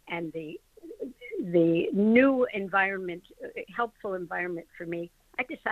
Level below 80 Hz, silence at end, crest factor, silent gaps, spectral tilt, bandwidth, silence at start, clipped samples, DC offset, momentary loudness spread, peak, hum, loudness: -66 dBFS; 0 s; 20 dB; none; -8 dB/octave; 13.5 kHz; 0.05 s; under 0.1%; under 0.1%; 19 LU; -8 dBFS; none; -28 LUFS